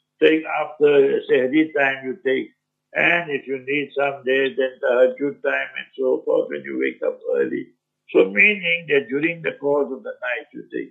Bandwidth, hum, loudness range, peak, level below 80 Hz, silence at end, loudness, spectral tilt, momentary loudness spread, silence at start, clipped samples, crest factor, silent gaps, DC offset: 4 kHz; none; 2 LU; -2 dBFS; -80 dBFS; 0 s; -20 LUFS; -7 dB/octave; 11 LU; 0.2 s; under 0.1%; 20 dB; none; under 0.1%